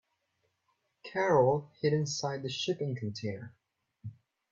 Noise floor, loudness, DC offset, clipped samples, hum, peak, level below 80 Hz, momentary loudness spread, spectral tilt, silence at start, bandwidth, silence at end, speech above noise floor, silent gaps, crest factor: -79 dBFS; -31 LUFS; under 0.1%; under 0.1%; none; -14 dBFS; -72 dBFS; 23 LU; -5 dB/octave; 1.05 s; 7.8 kHz; 0.4 s; 48 dB; none; 20 dB